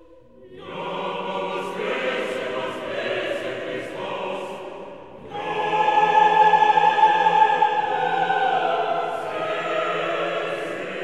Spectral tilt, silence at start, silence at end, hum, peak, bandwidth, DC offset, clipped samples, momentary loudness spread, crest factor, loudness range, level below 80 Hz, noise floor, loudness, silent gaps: -4 dB/octave; 0.4 s; 0 s; none; -4 dBFS; 11 kHz; 0.3%; under 0.1%; 15 LU; 18 dB; 10 LU; -64 dBFS; -48 dBFS; -22 LUFS; none